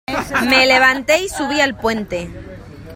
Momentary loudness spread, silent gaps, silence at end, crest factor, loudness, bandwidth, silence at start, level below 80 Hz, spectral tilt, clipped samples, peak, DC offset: 18 LU; none; 0 s; 18 dB; -15 LUFS; 16.5 kHz; 0.1 s; -42 dBFS; -3 dB/octave; under 0.1%; 0 dBFS; under 0.1%